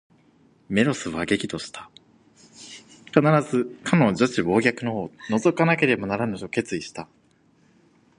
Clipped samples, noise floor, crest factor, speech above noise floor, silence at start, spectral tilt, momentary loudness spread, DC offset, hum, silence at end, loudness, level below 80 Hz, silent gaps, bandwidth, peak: under 0.1%; -60 dBFS; 24 dB; 38 dB; 0.7 s; -6 dB/octave; 20 LU; under 0.1%; none; 1.15 s; -23 LUFS; -58 dBFS; none; 11 kHz; 0 dBFS